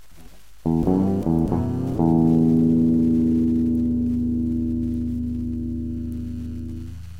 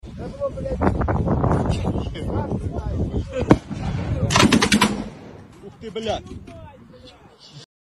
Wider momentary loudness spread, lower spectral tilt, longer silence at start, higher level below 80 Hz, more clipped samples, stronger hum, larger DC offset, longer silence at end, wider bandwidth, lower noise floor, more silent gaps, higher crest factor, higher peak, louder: second, 13 LU vs 22 LU; first, -10.5 dB/octave vs -5 dB/octave; first, 0.2 s vs 0.05 s; about the same, -36 dBFS vs -34 dBFS; neither; neither; first, 1% vs under 0.1%; second, 0 s vs 0.35 s; second, 4.7 kHz vs 14 kHz; about the same, -48 dBFS vs -46 dBFS; neither; second, 14 dB vs 22 dB; second, -6 dBFS vs 0 dBFS; about the same, -22 LUFS vs -22 LUFS